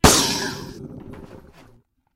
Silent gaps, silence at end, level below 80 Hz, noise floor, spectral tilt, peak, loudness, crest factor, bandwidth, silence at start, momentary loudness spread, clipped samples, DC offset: none; 0.8 s; -34 dBFS; -55 dBFS; -3 dB/octave; 0 dBFS; -20 LUFS; 22 dB; 16 kHz; 0.05 s; 25 LU; under 0.1%; under 0.1%